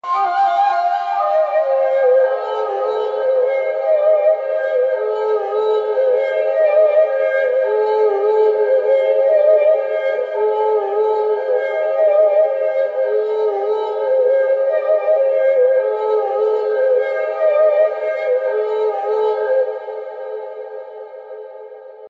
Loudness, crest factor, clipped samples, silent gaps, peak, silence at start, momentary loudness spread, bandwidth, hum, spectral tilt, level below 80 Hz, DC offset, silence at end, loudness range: -16 LUFS; 12 dB; under 0.1%; none; -4 dBFS; 0.05 s; 7 LU; 5.4 kHz; none; -3.5 dB/octave; -78 dBFS; under 0.1%; 0 s; 3 LU